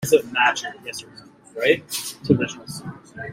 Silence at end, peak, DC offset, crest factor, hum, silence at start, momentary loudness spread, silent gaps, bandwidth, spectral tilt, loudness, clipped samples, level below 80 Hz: 0 s; -2 dBFS; under 0.1%; 20 dB; none; 0 s; 16 LU; none; 16 kHz; -4 dB/octave; -21 LUFS; under 0.1%; -58 dBFS